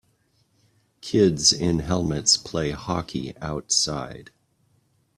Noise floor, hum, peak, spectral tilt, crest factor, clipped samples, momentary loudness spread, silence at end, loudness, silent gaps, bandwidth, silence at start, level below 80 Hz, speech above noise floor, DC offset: -66 dBFS; none; -4 dBFS; -3.5 dB/octave; 20 dB; under 0.1%; 14 LU; 0.95 s; -22 LUFS; none; 14 kHz; 1.05 s; -48 dBFS; 42 dB; under 0.1%